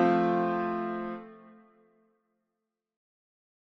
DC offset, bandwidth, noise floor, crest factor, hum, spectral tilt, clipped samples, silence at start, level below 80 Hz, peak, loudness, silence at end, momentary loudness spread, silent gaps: under 0.1%; 6.2 kHz; -86 dBFS; 20 dB; none; -8.5 dB/octave; under 0.1%; 0 s; -72 dBFS; -12 dBFS; -30 LUFS; 2.25 s; 17 LU; none